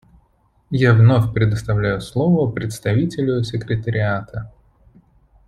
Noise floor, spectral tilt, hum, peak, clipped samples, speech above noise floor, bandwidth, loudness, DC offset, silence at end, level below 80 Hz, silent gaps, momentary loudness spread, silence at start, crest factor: -60 dBFS; -7.5 dB/octave; none; -2 dBFS; under 0.1%; 42 dB; 12 kHz; -18 LUFS; under 0.1%; 1 s; -44 dBFS; none; 13 LU; 0.7 s; 16 dB